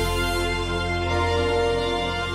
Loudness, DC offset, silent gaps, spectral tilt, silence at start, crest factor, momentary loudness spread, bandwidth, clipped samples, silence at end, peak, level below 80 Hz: -23 LUFS; under 0.1%; none; -5 dB/octave; 0 s; 14 dB; 3 LU; 15.5 kHz; under 0.1%; 0 s; -10 dBFS; -32 dBFS